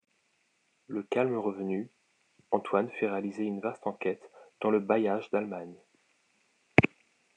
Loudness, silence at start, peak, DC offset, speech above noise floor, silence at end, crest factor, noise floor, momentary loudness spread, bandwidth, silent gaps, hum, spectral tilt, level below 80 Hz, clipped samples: -31 LUFS; 0.9 s; -2 dBFS; under 0.1%; 42 dB; 0.5 s; 30 dB; -73 dBFS; 13 LU; 9.6 kHz; none; none; -7.5 dB/octave; -64 dBFS; under 0.1%